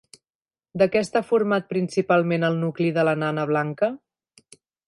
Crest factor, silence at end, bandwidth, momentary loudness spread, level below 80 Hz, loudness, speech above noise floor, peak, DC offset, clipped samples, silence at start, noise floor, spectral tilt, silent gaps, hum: 16 dB; 0.9 s; 11.5 kHz; 5 LU; -66 dBFS; -23 LUFS; over 68 dB; -8 dBFS; under 0.1%; under 0.1%; 0.75 s; under -90 dBFS; -7 dB/octave; none; none